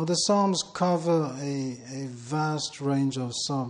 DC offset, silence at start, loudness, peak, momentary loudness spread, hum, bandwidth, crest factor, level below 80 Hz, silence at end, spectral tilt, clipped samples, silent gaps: under 0.1%; 0 s; -27 LUFS; -12 dBFS; 11 LU; none; 11.5 kHz; 16 dB; -70 dBFS; 0 s; -5 dB/octave; under 0.1%; none